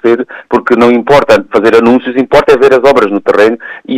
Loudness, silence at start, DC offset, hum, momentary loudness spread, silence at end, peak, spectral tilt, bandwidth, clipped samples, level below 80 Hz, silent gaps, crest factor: -7 LUFS; 0.05 s; under 0.1%; none; 7 LU; 0 s; 0 dBFS; -5.5 dB/octave; 14.5 kHz; 0.5%; -40 dBFS; none; 8 dB